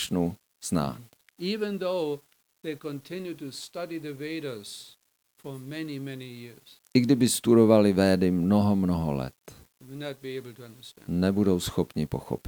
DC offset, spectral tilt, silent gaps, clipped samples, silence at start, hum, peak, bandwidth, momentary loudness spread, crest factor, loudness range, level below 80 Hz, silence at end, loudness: under 0.1%; -6 dB/octave; none; under 0.1%; 0 s; none; -6 dBFS; over 20 kHz; 21 LU; 22 dB; 14 LU; -58 dBFS; 0 s; -27 LUFS